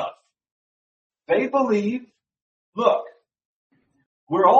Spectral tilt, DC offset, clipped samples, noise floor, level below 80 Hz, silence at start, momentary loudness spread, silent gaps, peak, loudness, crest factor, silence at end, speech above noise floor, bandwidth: -6.5 dB/octave; under 0.1%; under 0.1%; under -90 dBFS; -74 dBFS; 0 s; 13 LU; 0.52-1.10 s, 2.42-2.73 s, 3.45-3.70 s, 4.06-4.27 s; -4 dBFS; -23 LUFS; 20 dB; 0 s; over 71 dB; 7.8 kHz